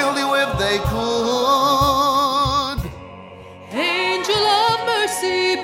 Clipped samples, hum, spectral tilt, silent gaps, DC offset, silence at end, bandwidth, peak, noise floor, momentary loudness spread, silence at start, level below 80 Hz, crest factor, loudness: under 0.1%; none; -3.5 dB/octave; none; under 0.1%; 0 s; 16 kHz; -4 dBFS; -38 dBFS; 13 LU; 0 s; -38 dBFS; 16 dB; -18 LUFS